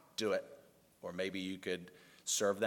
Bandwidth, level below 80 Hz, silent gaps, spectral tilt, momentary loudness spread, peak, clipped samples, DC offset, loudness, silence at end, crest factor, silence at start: 17.5 kHz; -82 dBFS; none; -2.5 dB/octave; 16 LU; -20 dBFS; under 0.1%; under 0.1%; -39 LUFS; 0 s; 18 dB; 0.2 s